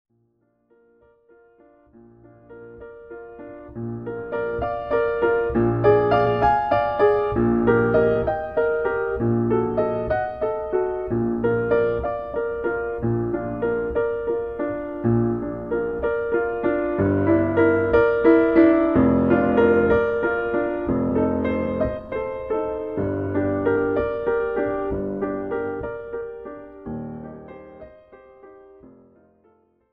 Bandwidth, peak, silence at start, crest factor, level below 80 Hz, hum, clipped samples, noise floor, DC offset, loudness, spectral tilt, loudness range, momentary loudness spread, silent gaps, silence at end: 5.4 kHz; -4 dBFS; 2.5 s; 18 dB; -44 dBFS; none; under 0.1%; -66 dBFS; 0.2%; -22 LUFS; -10.5 dB/octave; 14 LU; 15 LU; none; 1.05 s